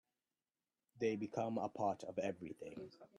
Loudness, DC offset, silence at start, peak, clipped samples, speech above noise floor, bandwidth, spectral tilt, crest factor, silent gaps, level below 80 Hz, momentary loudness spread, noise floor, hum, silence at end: -43 LUFS; under 0.1%; 0.95 s; -26 dBFS; under 0.1%; over 48 dB; 11.5 kHz; -6.5 dB/octave; 18 dB; none; -82 dBFS; 11 LU; under -90 dBFS; none; 0 s